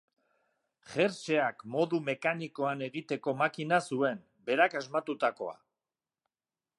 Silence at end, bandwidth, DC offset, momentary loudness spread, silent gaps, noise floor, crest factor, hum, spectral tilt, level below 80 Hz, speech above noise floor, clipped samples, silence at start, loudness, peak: 1.25 s; 11.5 kHz; under 0.1%; 8 LU; none; under -90 dBFS; 24 dB; none; -5.5 dB/octave; -82 dBFS; over 59 dB; under 0.1%; 0.9 s; -31 LUFS; -10 dBFS